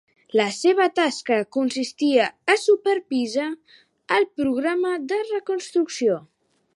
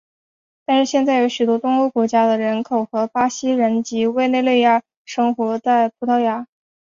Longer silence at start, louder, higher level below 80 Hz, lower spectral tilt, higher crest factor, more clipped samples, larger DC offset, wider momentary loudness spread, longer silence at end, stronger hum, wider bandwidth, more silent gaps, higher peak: second, 0.35 s vs 0.7 s; second, -22 LUFS vs -18 LUFS; about the same, -70 dBFS vs -66 dBFS; about the same, -3.5 dB/octave vs -4.5 dB/octave; about the same, 16 dB vs 14 dB; neither; neither; about the same, 7 LU vs 5 LU; first, 0.55 s vs 0.4 s; neither; first, 11.5 kHz vs 7.6 kHz; second, none vs 4.97-5.05 s; about the same, -6 dBFS vs -4 dBFS